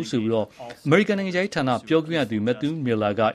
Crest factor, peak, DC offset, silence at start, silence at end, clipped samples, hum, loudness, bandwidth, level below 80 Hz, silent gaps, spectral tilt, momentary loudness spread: 20 dB; -4 dBFS; under 0.1%; 0 s; 0 s; under 0.1%; none; -23 LUFS; 12.5 kHz; -60 dBFS; none; -6.5 dB/octave; 6 LU